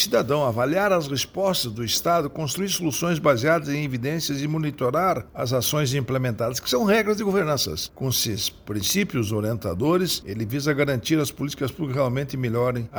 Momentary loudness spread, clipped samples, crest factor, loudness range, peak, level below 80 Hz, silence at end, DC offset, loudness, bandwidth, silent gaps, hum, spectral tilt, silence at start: 6 LU; under 0.1%; 16 dB; 2 LU; -6 dBFS; -52 dBFS; 0 s; under 0.1%; -23 LUFS; over 20 kHz; none; none; -4.5 dB/octave; 0 s